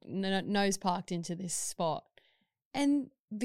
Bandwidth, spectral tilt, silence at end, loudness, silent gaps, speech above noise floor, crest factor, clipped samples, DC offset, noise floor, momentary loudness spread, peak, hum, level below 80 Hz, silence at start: 16 kHz; -4 dB/octave; 0 s; -33 LUFS; 2.65-2.71 s, 3.20-3.28 s; 42 dB; 20 dB; under 0.1%; under 0.1%; -74 dBFS; 9 LU; -14 dBFS; none; -66 dBFS; 0 s